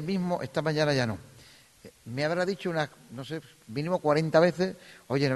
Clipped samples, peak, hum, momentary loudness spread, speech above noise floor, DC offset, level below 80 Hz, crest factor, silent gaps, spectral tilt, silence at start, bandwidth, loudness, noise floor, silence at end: under 0.1%; -8 dBFS; none; 16 LU; 27 dB; under 0.1%; -64 dBFS; 20 dB; none; -6 dB/octave; 0 s; 12.5 kHz; -28 LUFS; -55 dBFS; 0 s